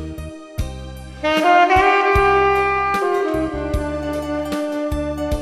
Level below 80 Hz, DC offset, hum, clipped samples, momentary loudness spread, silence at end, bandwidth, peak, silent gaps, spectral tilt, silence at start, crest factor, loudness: -32 dBFS; 0.1%; none; under 0.1%; 16 LU; 0 s; 14 kHz; -2 dBFS; none; -5.5 dB/octave; 0 s; 16 dB; -17 LUFS